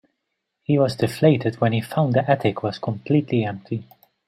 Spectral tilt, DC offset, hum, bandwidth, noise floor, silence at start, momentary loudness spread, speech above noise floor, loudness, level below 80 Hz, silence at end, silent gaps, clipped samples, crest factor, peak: -7.5 dB/octave; under 0.1%; none; 15 kHz; -78 dBFS; 0.7 s; 12 LU; 57 dB; -22 LUFS; -60 dBFS; 0.45 s; none; under 0.1%; 20 dB; -2 dBFS